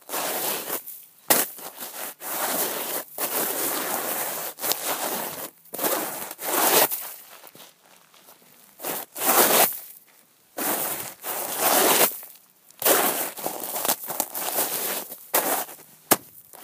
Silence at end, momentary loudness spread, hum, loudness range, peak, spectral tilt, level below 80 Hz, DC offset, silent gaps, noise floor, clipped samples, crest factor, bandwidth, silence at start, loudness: 0 s; 17 LU; none; 4 LU; 0 dBFS; -0.5 dB/octave; -76 dBFS; under 0.1%; none; -57 dBFS; under 0.1%; 26 dB; 16 kHz; 0.1 s; -23 LUFS